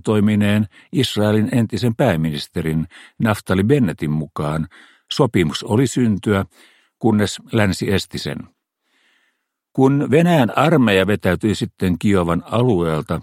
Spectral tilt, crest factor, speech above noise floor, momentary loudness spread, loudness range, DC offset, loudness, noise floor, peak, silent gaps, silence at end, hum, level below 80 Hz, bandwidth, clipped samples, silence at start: -6.5 dB/octave; 18 dB; 53 dB; 9 LU; 4 LU; under 0.1%; -18 LUFS; -70 dBFS; 0 dBFS; none; 0 s; none; -46 dBFS; 16 kHz; under 0.1%; 0.05 s